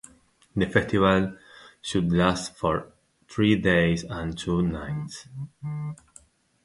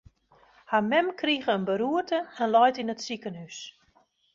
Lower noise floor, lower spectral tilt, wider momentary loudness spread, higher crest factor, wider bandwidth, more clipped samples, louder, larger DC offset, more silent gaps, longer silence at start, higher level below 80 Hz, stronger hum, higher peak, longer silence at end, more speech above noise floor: second, -58 dBFS vs -66 dBFS; first, -6 dB/octave vs -4.5 dB/octave; about the same, 16 LU vs 17 LU; about the same, 22 dB vs 18 dB; first, 11.5 kHz vs 7.6 kHz; neither; about the same, -25 LUFS vs -26 LUFS; neither; neither; second, 0.55 s vs 0.7 s; first, -46 dBFS vs -68 dBFS; neither; first, -4 dBFS vs -10 dBFS; about the same, 0.7 s vs 0.65 s; second, 34 dB vs 39 dB